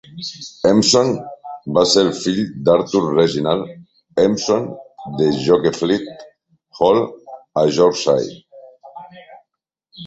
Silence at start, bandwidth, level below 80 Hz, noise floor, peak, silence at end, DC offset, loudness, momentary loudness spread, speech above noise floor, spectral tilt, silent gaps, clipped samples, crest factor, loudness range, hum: 0.1 s; 8.2 kHz; -54 dBFS; -77 dBFS; -2 dBFS; 0 s; under 0.1%; -17 LUFS; 17 LU; 61 dB; -4.5 dB/octave; none; under 0.1%; 16 dB; 3 LU; none